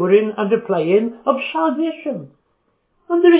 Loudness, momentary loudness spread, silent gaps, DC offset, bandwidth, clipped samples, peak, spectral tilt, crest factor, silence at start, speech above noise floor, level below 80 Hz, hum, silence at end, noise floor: -19 LUFS; 10 LU; none; under 0.1%; 4 kHz; under 0.1%; -2 dBFS; -10.5 dB/octave; 16 dB; 0 s; 49 dB; -72 dBFS; none; 0 s; -66 dBFS